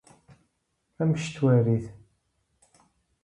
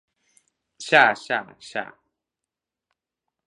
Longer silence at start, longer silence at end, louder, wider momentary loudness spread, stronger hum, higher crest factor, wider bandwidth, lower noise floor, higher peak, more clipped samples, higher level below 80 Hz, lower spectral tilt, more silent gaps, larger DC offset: first, 1 s vs 0.8 s; second, 1.3 s vs 1.65 s; second, -25 LUFS vs -21 LUFS; second, 8 LU vs 20 LU; neither; second, 18 dB vs 26 dB; about the same, 10.5 kHz vs 11.5 kHz; second, -76 dBFS vs -87 dBFS; second, -10 dBFS vs 0 dBFS; neither; first, -60 dBFS vs -78 dBFS; first, -8 dB/octave vs -3 dB/octave; neither; neither